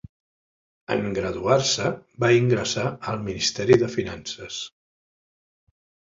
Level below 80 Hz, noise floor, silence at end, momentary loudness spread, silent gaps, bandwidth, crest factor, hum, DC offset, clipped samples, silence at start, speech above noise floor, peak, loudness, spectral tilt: -52 dBFS; under -90 dBFS; 1.45 s; 13 LU; none; 7.8 kHz; 22 dB; none; under 0.1%; under 0.1%; 0.9 s; over 67 dB; -4 dBFS; -23 LUFS; -4.5 dB/octave